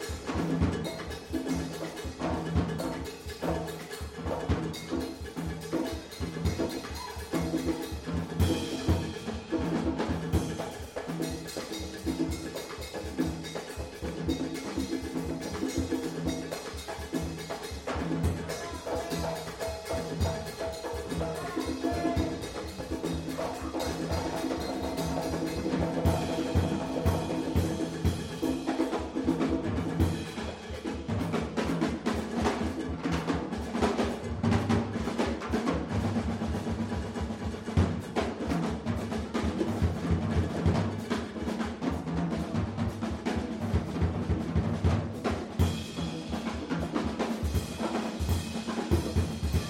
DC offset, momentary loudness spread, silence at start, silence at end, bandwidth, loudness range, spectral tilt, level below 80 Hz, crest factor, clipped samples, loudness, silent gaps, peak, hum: under 0.1%; 8 LU; 0 s; 0 s; 16.5 kHz; 4 LU; -6 dB/octave; -42 dBFS; 18 dB; under 0.1%; -32 LUFS; none; -14 dBFS; none